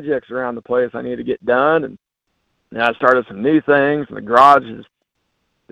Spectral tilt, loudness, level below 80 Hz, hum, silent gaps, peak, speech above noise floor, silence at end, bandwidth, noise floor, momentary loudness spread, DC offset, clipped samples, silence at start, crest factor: -6.5 dB/octave; -16 LUFS; -56 dBFS; none; none; 0 dBFS; 55 dB; 0.9 s; 10.5 kHz; -71 dBFS; 14 LU; under 0.1%; under 0.1%; 0 s; 18 dB